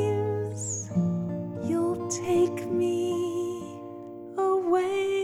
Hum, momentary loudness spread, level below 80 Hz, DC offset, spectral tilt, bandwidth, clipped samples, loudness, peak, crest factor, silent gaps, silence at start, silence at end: none; 12 LU; -66 dBFS; under 0.1%; -6 dB/octave; 13.5 kHz; under 0.1%; -28 LUFS; -14 dBFS; 14 dB; none; 0 s; 0 s